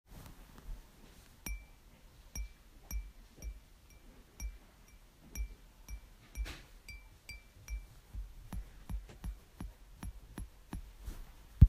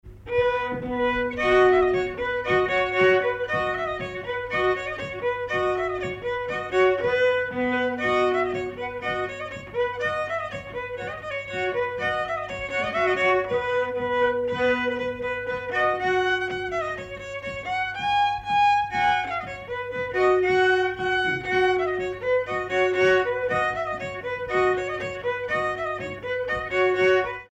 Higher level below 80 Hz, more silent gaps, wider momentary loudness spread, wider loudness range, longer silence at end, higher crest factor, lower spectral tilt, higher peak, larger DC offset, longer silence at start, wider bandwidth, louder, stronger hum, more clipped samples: about the same, -46 dBFS vs -50 dBFS; neither; first, 14 LU vs 10 LU; second, 2 LU vs 5 LU; about the same, 0 s vs 0.05 s; first, 32 dB vs 16 dB; about the same, -6 dB/octave vs -5.5 dB/octave; about the same, -8 dBFS vs -10 dBFS; neither; about the same, 0.1 s vs 0.05 s; first, 15.5 kHz vs 8.6 kHz; second, -50 LUFS vs -24 LUFS; neither; neither